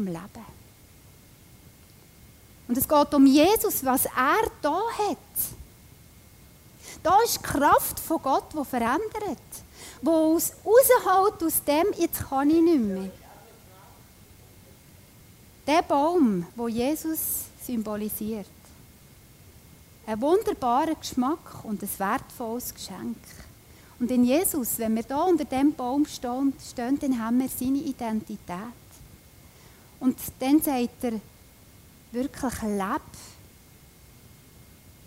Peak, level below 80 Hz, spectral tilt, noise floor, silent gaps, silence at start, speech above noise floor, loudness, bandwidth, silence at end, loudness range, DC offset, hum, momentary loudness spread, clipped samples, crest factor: -8 dBFS; -54 dBFS; -4 dB/octave; -52 dBFS; none; 0 s; 28 dB; -25 LUFS; 16 kHz; 1.75 s; 9 LU; under 0.1%; none; 16 LU; under 0.1%; 20 dB